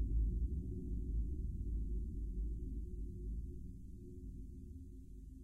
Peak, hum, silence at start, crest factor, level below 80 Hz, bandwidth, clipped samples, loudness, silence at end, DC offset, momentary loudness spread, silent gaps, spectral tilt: -28 dBFS; none; 0 s; 14 dB; -42 dBFS; 0.5 kHz; under 0.1%; -45 LUFS; 0 s; under 0.1%; 13 LU; none; -11 dB/octave